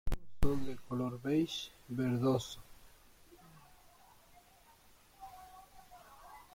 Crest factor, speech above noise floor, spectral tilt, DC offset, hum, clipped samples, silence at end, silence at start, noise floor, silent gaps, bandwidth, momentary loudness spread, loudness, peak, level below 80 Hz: 22 dB; 28 dB; -6.5 dB/octave; under 0.1%; none; under 0.1%; 0.15 s; 0.05 s; -63 dBFS; none; 16.5 kHz; 24 LU; -37 LUFS; -16 dBFS; -48 dBFS